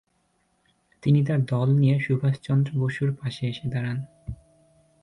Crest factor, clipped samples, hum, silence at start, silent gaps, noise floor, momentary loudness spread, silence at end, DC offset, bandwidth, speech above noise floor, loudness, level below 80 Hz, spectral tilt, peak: 14 dB; under 0.1%; none; 1.05 s; none; -69 dBFS; 15 LU; 0.7 s; under 0.1%; 10 kHz; 46 dB; -24 LUFS; -54 dBFS; -8.5 dB/octave; -10 dBFS